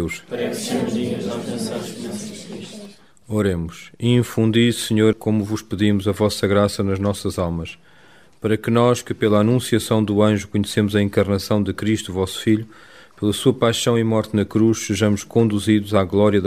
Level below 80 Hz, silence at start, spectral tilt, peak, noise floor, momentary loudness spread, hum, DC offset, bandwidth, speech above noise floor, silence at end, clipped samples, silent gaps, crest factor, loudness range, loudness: -48 dBFS; 0 s; -6 dB/octave; -2 dBFS; -51 dBFS; 11 LU; none; 0.2%; 15.5 kHz; 32 dB; 0 s; under 0.1%; none; 18 dB; 6 LU; -20 LUFS